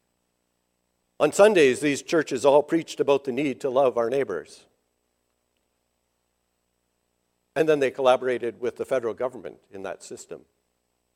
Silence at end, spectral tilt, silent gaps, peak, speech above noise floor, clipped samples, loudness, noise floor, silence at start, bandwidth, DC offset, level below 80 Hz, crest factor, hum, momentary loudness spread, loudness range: 0.8 s; -4.5 dB/octave; none; -4 dBFS; 52 dB; under 0.1%; -23 LUFS; -75 dBFS; 1.2 s; 15 kHz; under 0.1%; -70 dBFS; 22 dB; 60 Hz at -60 dBFS; 19 LU; 9 LU